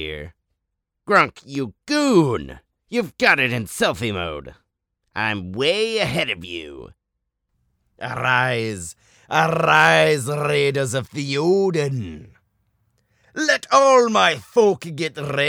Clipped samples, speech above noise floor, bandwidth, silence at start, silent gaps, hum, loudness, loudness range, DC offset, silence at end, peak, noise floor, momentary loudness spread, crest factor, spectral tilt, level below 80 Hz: under 0.1%; 59 dB; 17.5 kHz; 0 s; none; none; -19 LUFS; 6 LU; under 0.1%; 0 s; 0 dBFS; -78 dBFS; 17 LU; 20 dB; -4.5 dB/octave; -52 dBFS